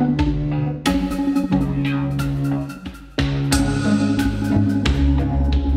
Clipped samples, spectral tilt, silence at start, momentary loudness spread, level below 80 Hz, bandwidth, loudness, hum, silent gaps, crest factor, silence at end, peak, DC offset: under 0.1%; -6.5 dB/octave; 0 s; 5 LU; -26 dBFS; 16 kHz; -20 LUFS; none; none; 16 dB; 0 s; -2 dBFS; under 0.1%